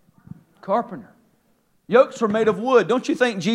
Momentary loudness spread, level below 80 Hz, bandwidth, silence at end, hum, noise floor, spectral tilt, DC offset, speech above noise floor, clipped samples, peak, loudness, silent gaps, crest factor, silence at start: 15 LU; -70 dBFS; 11 kHz; 0 s; none; -64 dBFS; -5.5 dB/octave; under 0.1%; 44 dB; under 0.1%; -2 dBFS; -20 LUFS; none; 20 dB; 0.65 s